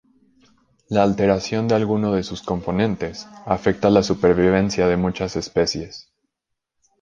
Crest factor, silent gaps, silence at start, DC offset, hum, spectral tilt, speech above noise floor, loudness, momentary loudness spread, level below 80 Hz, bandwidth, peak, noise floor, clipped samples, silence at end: 18 dB; none; 0.9 s; under 0.1%; none; -6 dB/octave; 61 dB; -20 LUFS; 11 LU; -44 dBFS; 7.6 kHz; -2 dBFS; -80 dBFS; under 0.1%; 1 s